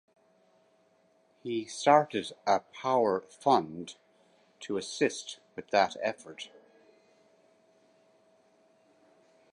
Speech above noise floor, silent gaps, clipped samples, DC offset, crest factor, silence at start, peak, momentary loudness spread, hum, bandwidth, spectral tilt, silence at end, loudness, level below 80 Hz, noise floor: 38 dB; none; under 0.1%; under 0.1%; 24 dB; 1.45 s; -8 dBFS; 20 LU; none; 11.5 kHz; -4 dB/octave; 3.05 s; -29 LUFS; -76 dBFS; -68 dBFS